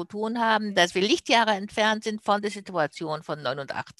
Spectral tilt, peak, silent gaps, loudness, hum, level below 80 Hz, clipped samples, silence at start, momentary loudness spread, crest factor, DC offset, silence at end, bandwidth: -3.5 dB/octave; -6 dBFS; none; -25 LUFS; none; -66 dBFS; under 0.1%; 0 s; 9 LU; 20 dB; under 0.1%; 0.1 s; 12.5 kHz